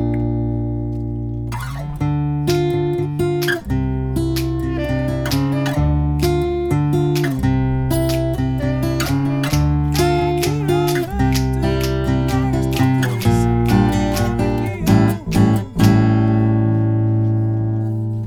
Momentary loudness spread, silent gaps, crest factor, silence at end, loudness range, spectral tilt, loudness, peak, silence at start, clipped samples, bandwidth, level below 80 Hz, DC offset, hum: 6 LU; none; 16 dB; 0 s; 4 LU; -7 dB/octave; -18 LUFS; 0 dBFS; 0 s; under 0.1%; 19 kHz; -28 dBFS; under 0.1%; none